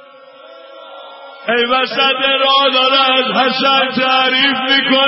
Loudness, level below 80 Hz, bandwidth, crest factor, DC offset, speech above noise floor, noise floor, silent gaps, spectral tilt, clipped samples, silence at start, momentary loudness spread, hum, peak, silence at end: -12 LUFS; -66 dBFS; 5.8 kHz; 14 dB; under 0.1%; 26 dB; -39 dBFS; none; -6.5 dB/octave; under 0.1%; 0.45 s; 4 LU; none; 0 dBFS; 0 s